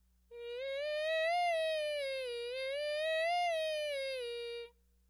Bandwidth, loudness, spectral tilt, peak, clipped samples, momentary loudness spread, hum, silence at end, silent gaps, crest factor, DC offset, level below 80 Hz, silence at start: 14.5 kHz; -36 LUFS; 0.5 dB/octave; -24 dBFS; under 0.1%; 12 LU; 60 Hz at -70 dBFS; 0.4 s; none; 12 dB; under 0.1%; -72 dBFS; 0.3 s